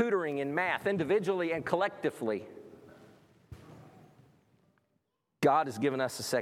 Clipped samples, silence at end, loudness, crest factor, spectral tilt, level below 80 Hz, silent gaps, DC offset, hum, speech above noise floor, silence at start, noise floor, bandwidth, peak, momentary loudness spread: under 0.1%; 0 s; -31 LUFS; 20 dB; -5 dB/octave; -72 dBFS; none; under 0.1%; none; 49 dB; 0 s; -79 dBFS; 16 kHz; -12 dBFS; 14 LU